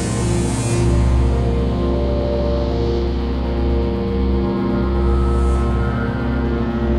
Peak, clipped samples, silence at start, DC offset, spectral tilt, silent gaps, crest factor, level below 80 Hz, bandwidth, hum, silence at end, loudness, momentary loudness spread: -6 dBFS; under 0.1%; 0 s; under 0.1%; -7 dB/octave; none; 12 dB; -20 dBFS; 11 kHz; none; 0 s; -19 LUFS; 3 LU